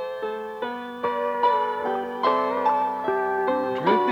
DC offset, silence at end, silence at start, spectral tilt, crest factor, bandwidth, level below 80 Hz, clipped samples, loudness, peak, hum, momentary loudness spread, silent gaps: under 0.1%; 0 s; 0 s; -6 dB/octave; 16 dB; 19.5 kHz; -68 dBFS; under 0.1%; -24 LUFS; -8 dBFS; none; 9 LU; none